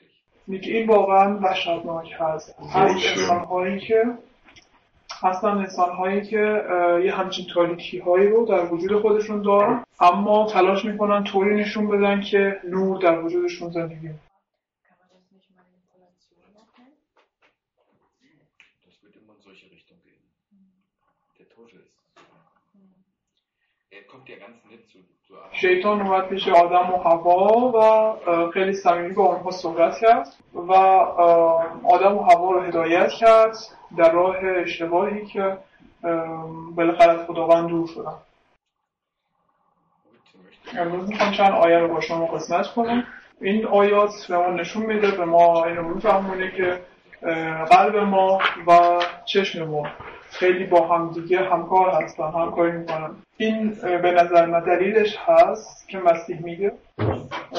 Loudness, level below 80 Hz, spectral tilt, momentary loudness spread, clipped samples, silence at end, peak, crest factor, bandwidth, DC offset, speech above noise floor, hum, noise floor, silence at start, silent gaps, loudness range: -20 LUFS; -58 dBFS; -5.5 dB/octave; 12 LU; under 0.1%; 0 s; -4 dBFS; 16 dB; 7.6 kHz; under 0.1%; 60 dB; none; -80 dBFS; 0.45 s; none; 6 LU